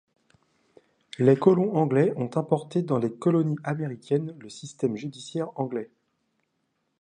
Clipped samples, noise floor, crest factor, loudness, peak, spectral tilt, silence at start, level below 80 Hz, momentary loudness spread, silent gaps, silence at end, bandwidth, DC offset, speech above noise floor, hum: under 0.1%; -76 dBFS; 22 dB; -26 LUFS; -6 dBFS; -8 dB/octave; 1.2 s; -72 dBFS; 15 LU; none; 1.15 s; 10 kHz; under 0.1%; 51 dB; none